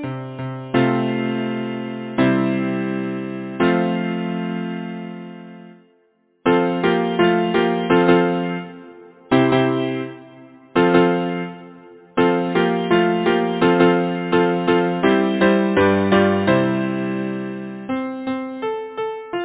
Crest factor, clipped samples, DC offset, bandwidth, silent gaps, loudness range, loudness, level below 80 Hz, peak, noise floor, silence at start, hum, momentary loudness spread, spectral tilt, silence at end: 16 dB; under 0.1%; under 0.1%; 4 kHz; none; 6 LU; -19 LUFS; -52 dBFS; -2 dBFS; -61 dBFS; 0 s; none; 13 LU; -10.5 dB/octave; 0 s